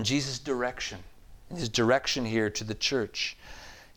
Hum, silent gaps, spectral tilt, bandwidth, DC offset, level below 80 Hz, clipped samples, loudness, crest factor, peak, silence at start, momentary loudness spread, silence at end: none; none; -3.5 dB/octave; 19 kHz; under 0.1%; -52 dBFS; under 0.1%; -29 LUFS; 20 dB; -12 dBFS; 0 s; 20 LU; 0.1 s